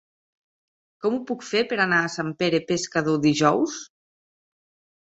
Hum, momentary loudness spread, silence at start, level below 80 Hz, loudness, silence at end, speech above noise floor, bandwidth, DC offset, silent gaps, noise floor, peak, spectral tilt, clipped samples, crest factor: none; 8 LU; 1.05 s; -64 dBFS; -23 LUFS; 1.15 s; over 67 dB; 8 kHz; under 0.1%; none; under -90 dBFS; -4 dBFS; -4.5 dB/octave; under 0.1%; 20 dB